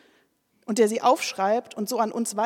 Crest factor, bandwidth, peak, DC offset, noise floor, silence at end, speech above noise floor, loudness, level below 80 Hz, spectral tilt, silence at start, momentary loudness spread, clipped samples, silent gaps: 18 dB; 17 kHz; -8 dBFS; under 0.1%; -66 dBFS; 0 s; 43 dB; -24 LUFS; -86 dBFS; -3.5 dB/octave; 0.7 s; 9 LU; under 0.1%; none